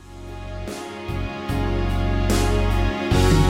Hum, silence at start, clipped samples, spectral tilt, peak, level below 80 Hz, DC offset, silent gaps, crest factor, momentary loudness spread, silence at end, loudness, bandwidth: none; 0 s; under 0.1%; -6 dB/octave; -4 dBFS; -26 dBFS; under 0.1%; none; 16 dB; 13 LU; 0 s; -23 LUFS; 16 kHz